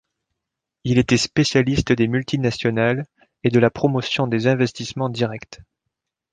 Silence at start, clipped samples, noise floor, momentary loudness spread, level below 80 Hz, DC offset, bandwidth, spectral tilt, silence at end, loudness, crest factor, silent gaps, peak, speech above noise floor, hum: 0.85 s; under 0.1%; -83 dBFS; 8 LU; -46 dBFS; under 0.1%; 9.4 kHz; -5.5 dB/octave; 0.8 s; -20 LUFS; 18 dB; none; -2 dBFS; 64 dB; none